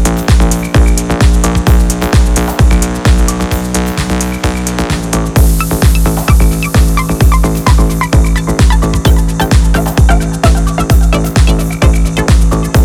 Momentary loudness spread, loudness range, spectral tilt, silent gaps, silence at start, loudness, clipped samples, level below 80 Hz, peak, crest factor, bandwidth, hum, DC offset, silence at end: 4 LU; 2 LU; -5.5 dB/octave; none; 0 s; -11 LUFS; under 0.1%; -10 dBFS; 0 dBFS; 8 dB; 16 kHz; none; under 0.1%; 0 s